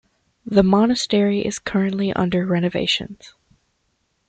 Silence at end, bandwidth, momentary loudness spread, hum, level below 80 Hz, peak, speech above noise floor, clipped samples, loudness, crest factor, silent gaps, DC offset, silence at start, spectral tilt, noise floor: 1 s; 9.2 kHz; 7 LU; none; -50 dBFS; -2 dBFS; 50 dB; under 0.1%; -19 LUFS; 18 dB; none; under 0.1%; 0.45 s; -5.5 dB/octave; -69 dBFS